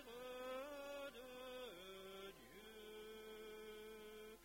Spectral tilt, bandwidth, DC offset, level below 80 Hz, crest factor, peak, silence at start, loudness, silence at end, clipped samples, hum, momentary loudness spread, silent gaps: -3 dB/octave; 16 kHz; under 0.1%; -76 dBFS; 16 dB; -38 dBFS; 0 s; -55 LUFS; 0 s; under 0.1%; none; 7 LU; none